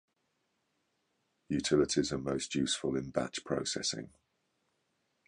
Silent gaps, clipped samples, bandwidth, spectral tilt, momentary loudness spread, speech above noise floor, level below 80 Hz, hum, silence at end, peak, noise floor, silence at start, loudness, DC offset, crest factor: none; under 0.1%; 11 kHz; -4 dB/octave; 7 LU; 46 dB; -62 dBFS; none; 1.2 s; -16 dBFS; -80 dBFS; 1.5 s; -33 LUFS; under 0.1%; 20 dB